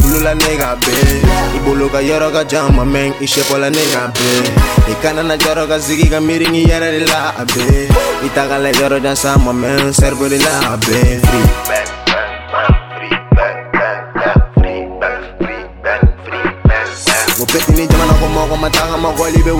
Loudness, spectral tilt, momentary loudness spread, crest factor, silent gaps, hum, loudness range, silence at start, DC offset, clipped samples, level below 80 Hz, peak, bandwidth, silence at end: -13 LUFS; -4.5 dB/octave; 6 LU; 12 dB; none; none; 3 LU; 0 s; 0.7%; under 0.1%; -18 dBFS; 0 dBFS; over 20 kHz; 0 s